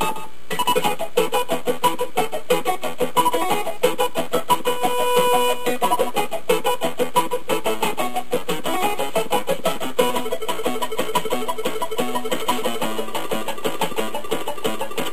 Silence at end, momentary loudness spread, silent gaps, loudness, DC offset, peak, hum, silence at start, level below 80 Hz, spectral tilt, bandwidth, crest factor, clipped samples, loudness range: 0 s; 6 LU; none; -22 LUFS; 7%; -4 dBFS; none; 0 s; -56 dBFS; -3 dB/octave; 15.5 kHz; 20 dB; under 0.1%; 4 LU